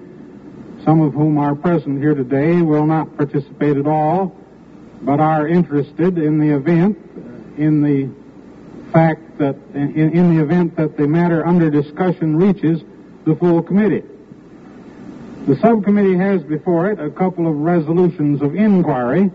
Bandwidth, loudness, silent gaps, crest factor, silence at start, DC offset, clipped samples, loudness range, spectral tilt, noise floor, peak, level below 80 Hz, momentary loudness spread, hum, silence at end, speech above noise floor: 5 kHz; -16 LUFS; none; 16 dB; 0 s; under 0.1%; under 0.1%; 2 LU; -9 dB/octave; -40 dBFS; 0 dBFS; -52 dBFS; 9 LU; none; 0 s; 25 dB